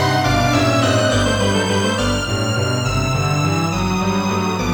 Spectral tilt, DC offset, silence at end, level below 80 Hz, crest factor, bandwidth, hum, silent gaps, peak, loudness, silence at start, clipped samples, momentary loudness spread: -5 dB/octave; under 0.1%; 0 s; -34 dBFS; 14 dB; 19.5 kHz; none; none; -2 dBFS; -17 LUFS; 0 s; under 0.1%; 4 LU